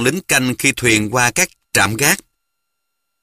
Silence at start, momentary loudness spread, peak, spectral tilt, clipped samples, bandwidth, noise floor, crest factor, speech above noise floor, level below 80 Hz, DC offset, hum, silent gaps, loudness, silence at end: 0 s; 3 LU; 0 dBFS; -3 dB/octave; under 0.1%; 15.5 kHz; -76 dBFS; 18 dB; 60 dB; -46 dBFS; under 0.1%; none; none; -15 LUFS; 1 s